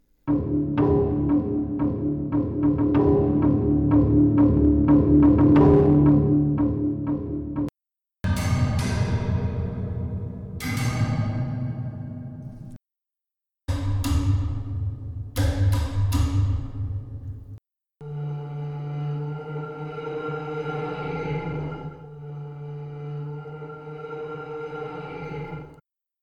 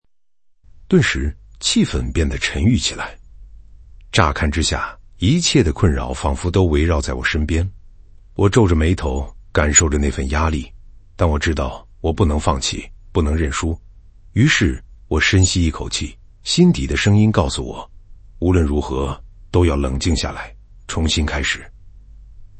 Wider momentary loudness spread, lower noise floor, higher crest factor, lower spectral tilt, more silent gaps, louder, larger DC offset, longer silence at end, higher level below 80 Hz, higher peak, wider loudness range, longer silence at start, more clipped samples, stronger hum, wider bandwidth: first, 19 LU vs 13 LU; first, -88 dBFS vs -65 dBFS; about the same, 16 dB vs 18 dB; first, -8.5 dB/octave vs -4.5 dB/octave; neither; second, -23 LUFS vs -18 LUFS; neither; first, 0.5 s vs 0 s; second, -36 dBFS vs -28 dBFS; second, -6 dBFS vs 0 dBFS; first, 15 LU vs 4 LU; second, 0.25 s vs 0.75 s; neither; neither; first, 14 kHz vs 8.8 kHz